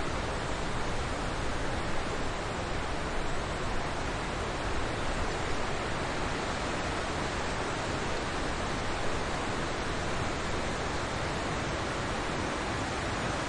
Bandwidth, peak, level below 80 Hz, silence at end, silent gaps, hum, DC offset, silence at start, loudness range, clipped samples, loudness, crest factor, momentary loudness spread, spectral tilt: 11 kHz; -18 dBFS; -40 dBFS; 0 s; none; none; under 0.1%; 0 s; 1 LU; under 0.1%; -33 LUFS; 14 dB; 2 LU; -4.5 dB/octave